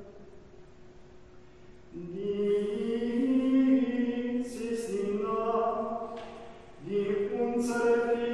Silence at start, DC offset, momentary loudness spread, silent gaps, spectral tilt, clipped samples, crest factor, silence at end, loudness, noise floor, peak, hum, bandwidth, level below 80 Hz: 0 s; 0.2%; 18 LU; none; -6.5 dB/octave; under 0.1%; 16 dB; 0 s; -30 LUFS; -54 dBFS; -16 dBFS; none; 12 kHz; -60 dBFS